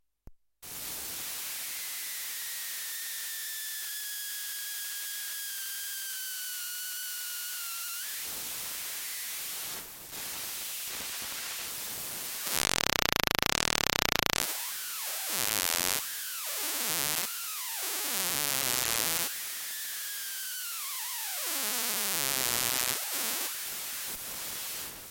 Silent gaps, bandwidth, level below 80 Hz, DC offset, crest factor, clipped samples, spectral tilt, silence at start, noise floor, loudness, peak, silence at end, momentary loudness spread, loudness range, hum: none; 17 kHz; -58 dBFS; under 0.1%; 32 dB; under 0.1%; 0 dB/octave; 0.25 s; -54 dBFS; -31 LUFS; -2 dBFS; 0 s; 8 LU; 7 LU; none